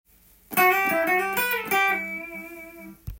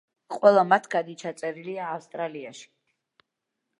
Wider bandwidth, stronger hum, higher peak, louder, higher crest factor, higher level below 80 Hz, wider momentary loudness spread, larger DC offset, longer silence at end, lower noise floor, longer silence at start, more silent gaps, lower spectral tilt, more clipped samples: first, 17 kHz vs 11 kHz; neither; second, -8 dBFS vs -2 dBFS; first, -22 LUFS vs -25 LUFS; second, 18 dB vs 24 dB; first, -52 dBFS vs -82 dBFS; first, 21 LU vs 18 LU; neither; second, 0 s vs 1.15 s; second, -45 dBFS vs -83 dBFS; first, 0.5 s vs 0.3 s; neither; second, -3 dB/octave vs -5 dB/octave; neither